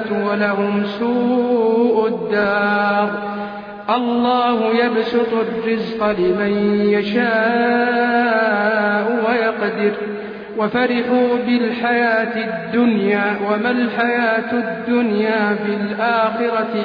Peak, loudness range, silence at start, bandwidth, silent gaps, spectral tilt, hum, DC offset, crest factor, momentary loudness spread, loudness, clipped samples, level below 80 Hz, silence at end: -4 dBFS; 2 LU; 0 s; 5.2 kHz; none; -8 dB/octave; none; under 0.1%; 14 dB; 5 LU; -17 LUFS; under 0.1%; -58 dBFS; 0 s